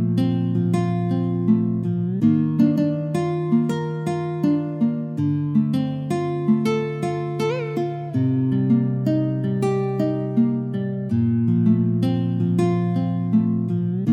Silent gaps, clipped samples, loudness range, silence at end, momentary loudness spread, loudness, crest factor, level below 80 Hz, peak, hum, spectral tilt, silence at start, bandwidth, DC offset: none; under 0.1%; 2 LU; 0 s; 6 LU; -21 LUFS; 14 dB; -66 dBFS; -6 dBFS; none; -9 dB/octave; 0 s; 10.5 kHz; under 0.1%